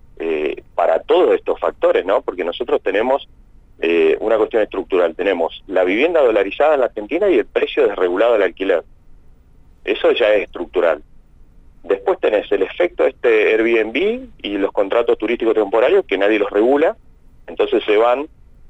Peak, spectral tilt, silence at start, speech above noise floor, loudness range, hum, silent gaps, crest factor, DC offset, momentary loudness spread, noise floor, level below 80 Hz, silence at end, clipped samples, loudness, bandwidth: -4 dBFS; -5.5 dB/octave; 0.2 s; 30 dB; 3 LU; none; none; 12 dB; under 0.1%; 8 LU; -46 dBFS; -46 dBFS; 0.45 s; under 0.1%; -17 LUFS; 8 kHz